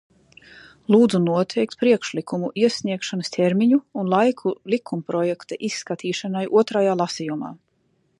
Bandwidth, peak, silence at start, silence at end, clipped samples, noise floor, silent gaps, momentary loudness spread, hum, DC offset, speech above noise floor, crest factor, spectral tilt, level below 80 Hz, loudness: 11 kHz; -4 dBFS; 0.55 s; 0.65 s; under 0.1%; -66 dBFS; none; 10 LU; none; under 0.1%; 45 dB; 18 dB; -6 dB/octave; -68 dBFS; -22 LUFS